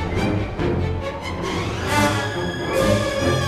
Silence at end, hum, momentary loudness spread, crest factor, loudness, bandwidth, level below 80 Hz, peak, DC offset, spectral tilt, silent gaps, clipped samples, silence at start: 0 s; none; 7 LU; 16 dB; -22 LUFS; 14 kHz; -34 dBFS; -6 dBFS; 0.2%; -5.5 dB/octave; none; under 0.1%; 0 s